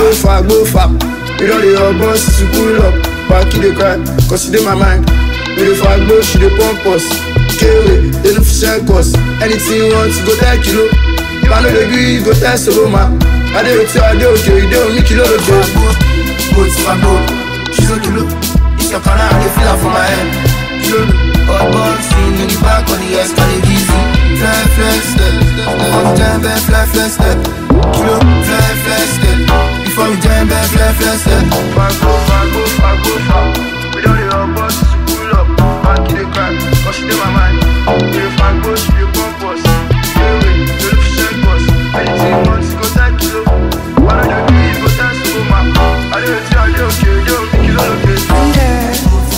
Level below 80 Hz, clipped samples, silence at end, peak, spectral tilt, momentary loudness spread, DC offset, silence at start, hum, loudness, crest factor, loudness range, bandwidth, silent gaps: -14 dBFS; under 0.1%; 0 s; 0 dBFS; -5 dB/octave; 4 LU; 1%; 0 s; none; -10 LUFS; 10 dB; 2 LU; 16.5 kHz; none